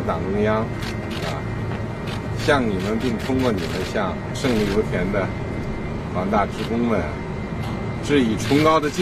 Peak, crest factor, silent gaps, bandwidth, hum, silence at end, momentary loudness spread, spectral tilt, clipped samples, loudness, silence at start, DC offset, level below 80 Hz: -4 dBFS; 18 dB; none; 15 kHz; none; 0 s; 8 LU; -6 dB/octave; under 0.1%; -22 LUFS; 0 s; under 0.1%; -36 dBFS